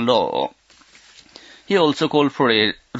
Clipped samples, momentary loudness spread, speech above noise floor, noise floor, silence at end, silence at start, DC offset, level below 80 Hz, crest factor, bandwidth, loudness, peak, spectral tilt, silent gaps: under 0.1%; 8 LU; 33 dB; -51 dBFS; 0 s; 0 s; under 0.1%; -62 dBFS; 18 dB; 8 kHz; -19 LUFS; -2 dBFS; -5 dB/octave; none